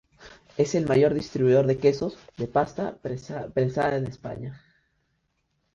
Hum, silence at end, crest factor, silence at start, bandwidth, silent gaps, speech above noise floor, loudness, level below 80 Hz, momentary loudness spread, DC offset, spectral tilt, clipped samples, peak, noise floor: none; 1.2 s; 18 dB; 0.2 s; 7.8 kHz; none; 49 dB; -25 LUFS; -56 dBFS; 15 LU; under 0.1%; -7 dB/octave; under 0.1%; -8 dBFS; -74 dBFS